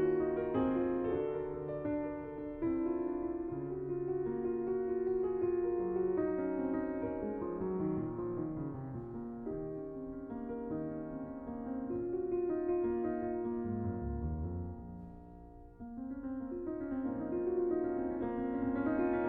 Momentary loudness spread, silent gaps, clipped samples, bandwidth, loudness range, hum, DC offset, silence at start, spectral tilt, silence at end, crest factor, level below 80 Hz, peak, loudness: 10 LU; none; under 0.1%; 3.4 kHz; 6 LU; none; under 0.1%; 0 s; -9.5 dB/octave; 0 s; 14 dB; -54 dBFS; -22 dBFS; -37 LUFS